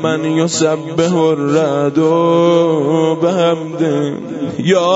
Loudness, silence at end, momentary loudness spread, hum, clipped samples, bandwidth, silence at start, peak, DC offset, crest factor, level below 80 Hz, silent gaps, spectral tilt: -14 LUFS; 0 s; 6 LU; none; under 0.1%; 8 kHz; 0 s; -2 dBFS; under 0.1%; 12 dB; -60 dBFS; none; -5.5 dB/octave